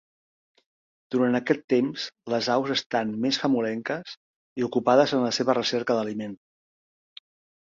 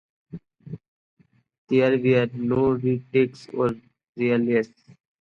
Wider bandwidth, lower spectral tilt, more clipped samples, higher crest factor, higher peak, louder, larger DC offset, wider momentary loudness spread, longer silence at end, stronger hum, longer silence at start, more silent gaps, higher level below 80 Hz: about the same, 7.6 kHz vs 7.2 kHz; second, -5 dB/octave vs -8.5 dB/octave; neither; about the same, 20 dB vs 18 dB; about the same, -6 dBFS vs -6 dBFS; about the same, -25 LUFS vs -23 LUFS; neither; second, 13 LU vs 22 LU; first, 1.3 s vs 0.55 s; neither; first, 1.1 s vs 0.35 s; about the same, 1.64-1.68 s, 2.86-2.90 s, 4.17-4.56 s vs 0.88-1.17 s, 1.58-1.67 s, 4.09-4.13 s; second, -70 dBFS vs -58 dBFS